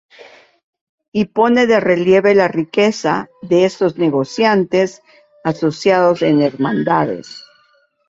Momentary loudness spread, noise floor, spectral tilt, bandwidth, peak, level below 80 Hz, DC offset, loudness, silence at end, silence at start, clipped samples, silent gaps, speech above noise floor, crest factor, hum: 10 LU; -57 dBFS; -6 dB/octave; 7.8 kHz; -2 dBFS; -58 dBFS; under 0.1%; -15 LUFS; 0.7 s; 1.15 s; under 0.1%; none; 42 dB; 14 dB; none